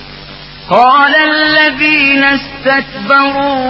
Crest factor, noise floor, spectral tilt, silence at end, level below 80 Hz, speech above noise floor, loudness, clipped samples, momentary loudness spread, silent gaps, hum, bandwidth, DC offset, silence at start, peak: 10 dB; -30 dBFS; -6 dB/octave; 0 s; -42 dBFS; 21 dB; -8 LUFS; 0.2%; 19 LU; none; none; 7 kHz; under 0.1%; 0 s; 0 dBFS